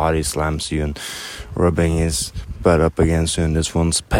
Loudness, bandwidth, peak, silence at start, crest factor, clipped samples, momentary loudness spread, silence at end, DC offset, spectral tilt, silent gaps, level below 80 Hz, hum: -19 LUFS; 16.5 kHz; -2 dBFS; 0 s; 18 dB; under 0.1%; 11 LU; 0 s; under 0.1%; -5 dB/octave; none; -28 dBFS; none